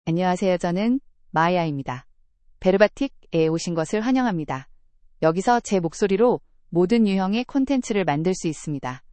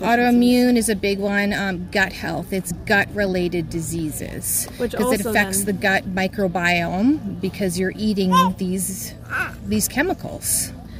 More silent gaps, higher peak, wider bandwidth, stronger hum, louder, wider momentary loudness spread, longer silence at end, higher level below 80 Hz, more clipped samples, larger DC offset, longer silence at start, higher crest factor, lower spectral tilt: neither; about the same, -2 dBFS vs -4 dBFS; second, 8.8 kHz vs 16 kHz; neither; about the same, -22 LUFS vs -20 LUFS; about the same, 10 LU vs 9 LU; first, 0.15 s vs 0 s; second, -50 dBFS vs -42 dBFS; neither; neither; about the same, 0.05 s vs 0 s; about the same, 20 dB vs 18 dB; first, -6 dB/octave vs -4 dB/octave